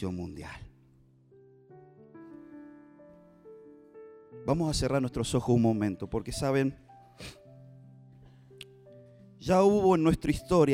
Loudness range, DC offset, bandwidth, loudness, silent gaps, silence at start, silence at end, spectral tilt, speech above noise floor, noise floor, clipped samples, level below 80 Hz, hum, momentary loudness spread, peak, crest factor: 20 LU; under 0.1%; 16 kHz; -28 LUFS; none; 0 s; 0 s; -6.5 dB/octave; 34 dB; -61 dBFS; under 0.1%; -50 dBFS; none; 26 LU; -10 dBFS; 20 dB